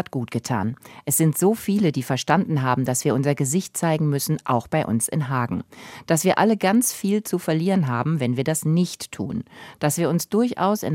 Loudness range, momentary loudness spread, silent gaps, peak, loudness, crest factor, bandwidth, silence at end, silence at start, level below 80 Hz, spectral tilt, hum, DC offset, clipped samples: 2 LU; 10 LU; none; -2 dBFS; -22 LUFS; 20 dB; 17 kHz; 0 s; 0 s; -60 dBFS; -5.5 dB/octave; none; under 0.1%; under 0.1%